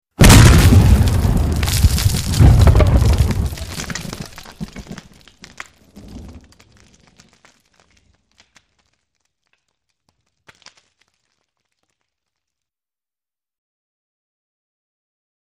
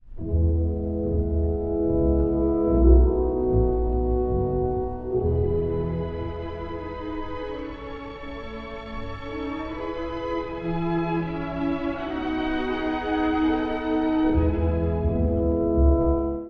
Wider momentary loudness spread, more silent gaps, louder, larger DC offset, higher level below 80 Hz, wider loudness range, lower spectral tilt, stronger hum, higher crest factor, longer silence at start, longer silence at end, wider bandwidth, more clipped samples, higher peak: first, 28 LU vs 12 LU; neither; first, -13 LUFS vs -25 LUFS; neither; first, -22 dBFS vs -28 dBFS; first, 26 LU vs 11 LU; second, -5 dB/octave vs -10 dB/octave; neither; about the same, 18 dB vs 18 dB; first, 0.2 s vs 0.05 s; first, 9.35 s vs 0 s; first, 15.5 kHz vs 4.9 kHz; neither; first, 0 dBFS vs -6 dBFS